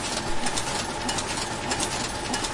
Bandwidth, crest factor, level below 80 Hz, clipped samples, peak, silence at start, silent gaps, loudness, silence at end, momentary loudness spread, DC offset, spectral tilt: 11.5 kHz; 18 dB; -42 dBFS; under 0.1%; -10 dBFS; 0 s; none; -27 LUFS; 0 s; 2 LU; under 0.1%; -2.5 dB/octave